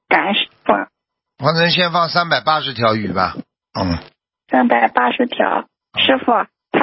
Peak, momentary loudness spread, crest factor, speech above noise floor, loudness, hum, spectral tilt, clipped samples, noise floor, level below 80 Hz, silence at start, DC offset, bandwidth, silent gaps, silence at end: 0 dBFS; 10 LU; 18 dB; 59 dB; -16 LUFS; none; -8.5 dB/octave; under 0.1%; -76 dBFS; -44 dBFS; 0.1 s; under 0.1%; 5.8 kHz; none; 0 s